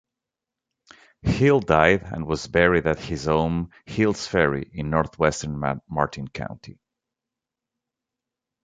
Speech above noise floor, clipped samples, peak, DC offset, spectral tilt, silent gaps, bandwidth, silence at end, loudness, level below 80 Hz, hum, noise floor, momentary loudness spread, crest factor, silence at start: 65 dB; under 0.1%; -2 dBFS; under 0.1%; -6 dB/octave; none; 9.4 kHz; 1.95 s; -23 LUFS; -42 dBFS; none; -87 dBFS; 13 LU; 22 dB; 1.25 s